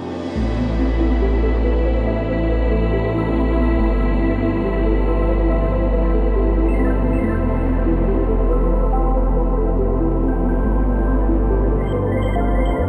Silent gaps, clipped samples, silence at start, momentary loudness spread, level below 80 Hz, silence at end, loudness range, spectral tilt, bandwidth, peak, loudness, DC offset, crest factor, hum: none; under 0.1%; 0 s; 2 LU; -18 dBFS; 0 s; 1 LU; -9.5 dB/octave; 4.7 kHz; -6 dBFS; -19 LUFS; under 0.1%; 12 dB; none